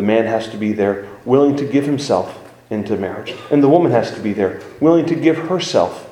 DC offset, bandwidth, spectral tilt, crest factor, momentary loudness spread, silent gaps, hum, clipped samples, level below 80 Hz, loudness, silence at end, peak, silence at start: under 0.1%; 11.5 kHz; -6.5 dB/octave; 16 dB; 10 LU; none; none; under 0.1%; -58 dBFS; -17 LUFS; 0 s; 0 dBFS; 0 s